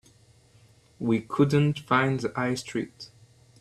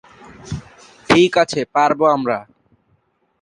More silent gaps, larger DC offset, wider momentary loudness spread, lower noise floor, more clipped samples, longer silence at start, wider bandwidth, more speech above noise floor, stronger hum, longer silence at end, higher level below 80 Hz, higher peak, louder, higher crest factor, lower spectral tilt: neither; neither; second, 15 LU vs 18 LU; second, -58 dBFS vs -63 dBFS; neither; first, 1 s vs 0.45 s; about the same, 12.5 kHz vs 11.5 kHz; second, 33 dB vs 47 dB; neither; second, 0.55 s vs 1 s; second, -60 dBFS vs -48 dBFS; second, -8 dBFS vs 0 dBFS; second, -26 LUFS vs -16 LUFS; about the same, 20 dB vs 18 dB; first, -6.5 dB/octave vs -5 dB/octave